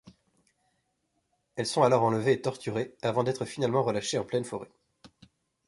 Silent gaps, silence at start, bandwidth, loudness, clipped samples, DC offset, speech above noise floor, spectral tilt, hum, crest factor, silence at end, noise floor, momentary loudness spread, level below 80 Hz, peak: none; 0.05 s; 11.5 kHz; -28 LUFS; under 0.1%; under 0.1%; 49 dB; -5.5 dB/octave; none; 22 dB; 0.6 s; -77 dBFS; 11 LU; -68 dBFS; -8 dBFS